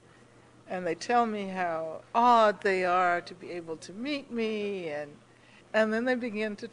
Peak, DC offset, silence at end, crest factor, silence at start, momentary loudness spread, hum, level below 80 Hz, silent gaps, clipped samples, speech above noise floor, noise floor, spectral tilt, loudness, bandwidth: -10 dBFS; under 0.1%; 0.05 s; 18 dB; 0.65 s; 16 LU; none; -74 dBFS; none; under 0.1%; 28 dB; -57 dBFS; -5 dB/octave; -28 LUFS; 10 kHz